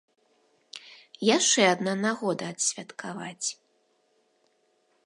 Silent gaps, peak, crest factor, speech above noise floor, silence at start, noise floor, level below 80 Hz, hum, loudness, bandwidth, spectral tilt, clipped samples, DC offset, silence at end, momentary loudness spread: none; -6 dBFS; 24 dB; 43 dB; 0.75 s; -70 dBFS; -82 dBFS; none; -26 LUFS; 11.5 kHz; -2.5 dB/octave; under 0.1%; under 0.1%; 1.5 s; 24 LU